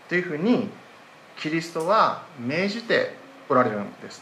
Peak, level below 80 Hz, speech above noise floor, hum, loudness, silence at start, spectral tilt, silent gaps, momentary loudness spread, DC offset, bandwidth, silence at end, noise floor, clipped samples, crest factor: -6 dBFS; -76 dBFS; 24 dB; none; -24 LUFS; 0.1 s; -5.5 dB/octave; none; 14 LU; under 0.1%; 13.5 kHz; 0 s; -48 dBFS; under 0.1%; 18 dB